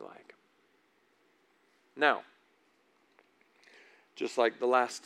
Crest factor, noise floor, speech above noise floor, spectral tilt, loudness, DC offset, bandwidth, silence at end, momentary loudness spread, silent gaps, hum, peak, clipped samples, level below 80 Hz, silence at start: 26 dB; -70 dBFS; 41 dB; -2.5 dB/octave; -30 LUFS; under 0.1%; 13 kHz; 0.05 s; 24 LU; none; none; -10 dBFS; under 0.1%; under -90 dBFS; 0 s